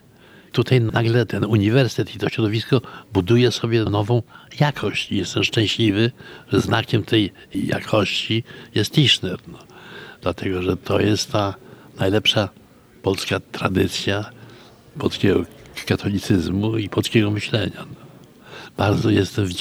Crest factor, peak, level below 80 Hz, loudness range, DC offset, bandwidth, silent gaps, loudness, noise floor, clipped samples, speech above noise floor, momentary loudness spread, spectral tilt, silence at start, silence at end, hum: 18 dB; -2 dBFS; -50 dBFS; 3 LU; under 0.1%; over 20 kHz; none; -20 LUFS; -48 dBFS; under 0.1%; 28 dB; 11 LU; -5.5 dB/octave; 0.55 s; 0 s; none